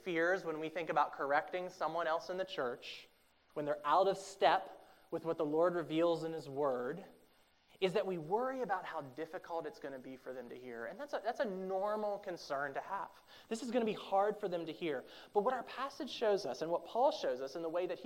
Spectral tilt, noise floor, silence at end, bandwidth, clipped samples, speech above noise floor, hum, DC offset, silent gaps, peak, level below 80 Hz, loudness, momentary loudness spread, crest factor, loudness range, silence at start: -5 dB/octave; -69 dBFS; 0 s; 16 kHz; under 0.1%; 32 dB; none; under 0.1%; none; -16 dBFS; -80 dBFS; -38 LUFS; 13 LU; 22 dB; 6 LU; 0 s